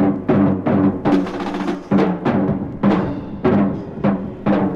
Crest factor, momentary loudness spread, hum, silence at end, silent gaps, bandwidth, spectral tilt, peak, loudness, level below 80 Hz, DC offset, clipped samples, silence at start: 14 dB; 6 LU; none; 0 s; none; 7 kHz; -9 dB/octave; -2 dBFS; -18 LUFS; -42 dBFS; under 0.1%; under 0.1%; 0 s